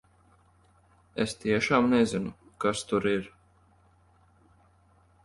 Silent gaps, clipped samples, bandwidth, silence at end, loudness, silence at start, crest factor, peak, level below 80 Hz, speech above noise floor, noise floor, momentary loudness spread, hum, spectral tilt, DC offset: none; under 0.1%; 11.5 kHz; 1.95 s; -27 LUFS; 1.15 s; 20 dB; -10 dBFS; -60 dBFS; 36 dB; -62 dBFS; 14 LU; none; -5 dB/octave; under 0.1%